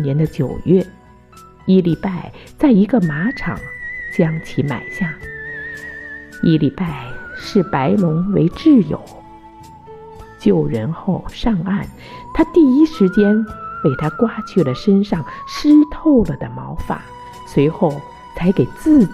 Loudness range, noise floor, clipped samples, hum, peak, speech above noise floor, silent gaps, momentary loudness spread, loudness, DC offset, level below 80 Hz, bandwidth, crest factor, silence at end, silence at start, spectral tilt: 5 LU; -43 dBFS; under 0.1%; none; -2 dBFS; 27 dB; none; 16 LU; -17 LUFS; under 0.1%; -38 dBFS; 12 kHz; 14 dB; 0 s; 0 s; -8 dB/octave